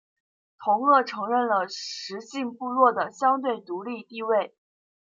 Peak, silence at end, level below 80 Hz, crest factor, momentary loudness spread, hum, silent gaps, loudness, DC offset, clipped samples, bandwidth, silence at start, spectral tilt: -6 dBFS; 0.55 s; -82 dBFS; 20 dB; 13 LU; none; none; -25 LUFS; under 0.1%; under 0.1%; 7.6 kHz; 0.6 s; -4 dB/octave